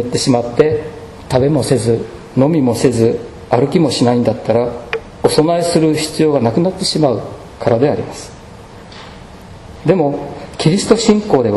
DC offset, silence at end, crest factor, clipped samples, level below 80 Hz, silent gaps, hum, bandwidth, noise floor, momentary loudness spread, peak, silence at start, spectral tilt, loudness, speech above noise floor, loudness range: under 0.1%; 0 s; 14 dB; 0.2%; -42 dBFS; none; none; 12.5 kHz; -35 dBFS; 16 LU; 0 dBFS; 0 s; -6 dB/octave; -14 LUFS; 22 dB; 5 LU